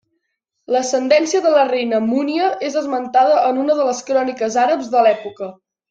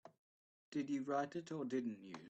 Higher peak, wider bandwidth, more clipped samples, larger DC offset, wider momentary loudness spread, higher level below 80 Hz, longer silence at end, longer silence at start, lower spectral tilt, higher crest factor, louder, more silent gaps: first, -2 dBFS vs -26 dBFS; about the same, 9 kHz vs 8.4 kHz; neither; neither; about the same, 7 LU vs 6 LU; first, -68 dBFS vs -88 dBFS; first, 0.4 s vs 0 s; first, 0.7 s vs 0.05 s; second, -3.5 dB/octave vs -6.5 dB/octave; about the same, 16 dB vs 18 dB; first, -17 LUFS vs -43 LUFS; second, none vs 0.18-0.72 s